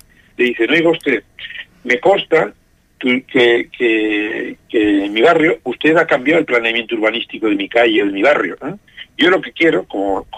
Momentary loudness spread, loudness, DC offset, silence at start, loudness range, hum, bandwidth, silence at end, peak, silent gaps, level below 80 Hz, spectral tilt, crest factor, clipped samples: 10 LU; -15 LUFS; under 0.1%; 0.4 s; 2 LU; none; 10 kHz; 0 s; -2 dBFS; none; -52 dBFS; -5.5 dB/octave; 14 dB; under 0.1%